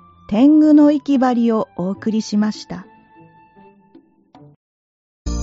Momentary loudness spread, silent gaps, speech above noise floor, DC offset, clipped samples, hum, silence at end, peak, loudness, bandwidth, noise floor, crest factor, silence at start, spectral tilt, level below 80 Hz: 20 LU; 4.56-5.25 s; 36 dB; under 0.1%; under 0.1%; none; 0 s; -4 dBFS; -15 LUFS; 7.8 kHz; -50 dBFS; 14 dB; 0.3 s; -6.5 dB/octave; -40 dBFS